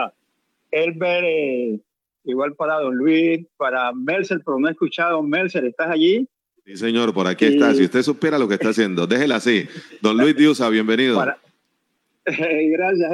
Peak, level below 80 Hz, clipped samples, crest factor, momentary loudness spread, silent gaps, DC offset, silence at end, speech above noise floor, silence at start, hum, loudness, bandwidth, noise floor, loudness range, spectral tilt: -2 dBFS; -82 dBFS; under 0.1%; 16 dB; 10 LU; none; under 0.1%; 0 s; 52 dB; 0 s; none; -19 LUFS; 11.5 kHz; -71 dBFS; 3 LU; -5.5 dB/octave